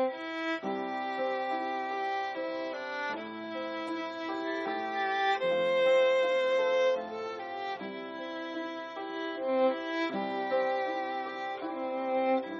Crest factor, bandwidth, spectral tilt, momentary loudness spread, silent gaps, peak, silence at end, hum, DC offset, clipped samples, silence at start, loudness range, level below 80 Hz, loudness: 16 dB; 7.6 kHz; -1.5 dB/octave; 11 LU; none; -16 dBFS; 0 s; none; under 0.1%; under 0.1%; 0 s; 6 LU; -80 dBFS; -32 LUFS